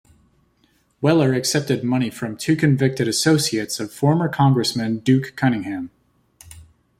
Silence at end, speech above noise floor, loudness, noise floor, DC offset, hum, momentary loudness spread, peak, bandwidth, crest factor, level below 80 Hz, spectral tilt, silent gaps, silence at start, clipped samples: 0.4 s; 43 dB; -20 LUFS; -62 dBFS; under 0.1%; none; 9 LU; -4 dBFS; 15.5 kHz; 18 dB; -56 dBFS; -5.5 dB/octave; none; 1 s; under 0.1%